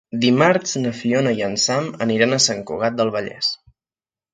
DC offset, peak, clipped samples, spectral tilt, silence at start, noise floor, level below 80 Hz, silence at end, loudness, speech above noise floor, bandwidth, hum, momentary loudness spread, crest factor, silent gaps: under 0.1%; -2 dBFS; under 0.1%; -3.5 dB/octave; 0.15 s; under -90 dBFS; -60 dBFS; 0.8 s; -19 LUFS; over 71 dB; 9.6 kHz; none; 8 LU; 18 dB; none